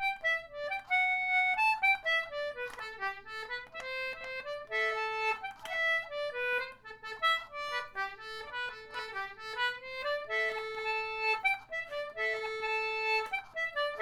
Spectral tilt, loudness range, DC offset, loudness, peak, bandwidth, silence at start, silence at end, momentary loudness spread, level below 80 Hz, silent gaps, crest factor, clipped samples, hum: -1 dB/octave; 5 LU; under 0.1%; -33 LUFS; -18 dBFS; 17.5 kHz; 0 s; 0 s; 12 LU; -66 dBFS; none; 16 dB; under 0.1%; none